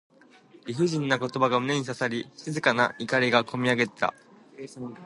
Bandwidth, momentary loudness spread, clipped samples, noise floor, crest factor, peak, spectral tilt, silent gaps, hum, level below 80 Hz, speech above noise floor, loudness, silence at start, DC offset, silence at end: 11.5 kHz; 16 LU; under 0.1%; -55 dBFS; 22 dB; -6 dBFS; -5 dB/octave; none; none; -70 dBFS; 28 dB; -26 LUFS; 0.65 s; under 0.1%; 0 s